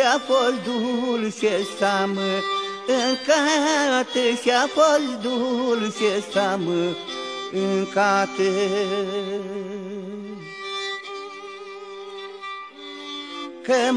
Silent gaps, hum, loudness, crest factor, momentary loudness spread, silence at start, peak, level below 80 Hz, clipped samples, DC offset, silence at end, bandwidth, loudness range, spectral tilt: none; none; -22 LUFS; 18 dB; 16 LU; 0 s; -4 dBFS; -74 dBFS; under 0.1%; under 0.1%; 0 s; 11 kHz; 12 LU; -3.5 dB/octave